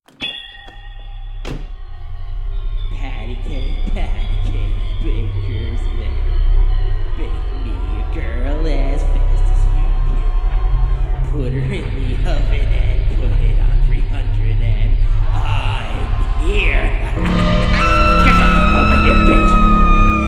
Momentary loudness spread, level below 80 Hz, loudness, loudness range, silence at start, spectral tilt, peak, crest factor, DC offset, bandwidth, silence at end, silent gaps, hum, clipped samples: 16 LU; -16 dBFS; -18 LUFS; 12 LU; 0.2 s; -6.5 dB/octave; 0 dBFS; 14 dB; under 0.1%; 8 kHz; 0 s; none; none; under 0.1%